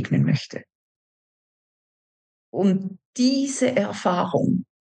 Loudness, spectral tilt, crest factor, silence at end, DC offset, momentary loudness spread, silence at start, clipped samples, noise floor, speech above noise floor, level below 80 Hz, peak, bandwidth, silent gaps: -23 LUFS; -6 dB/octave; 16 dB; 0.2 s; under 0.1%; 12 LU; 0 s; under 0.1%; under -90 dBFS; over 68 dB; -74 dBFS; -8 dBFS; 10 kHz; 0.75-2.53 s, 3.05-3.13 s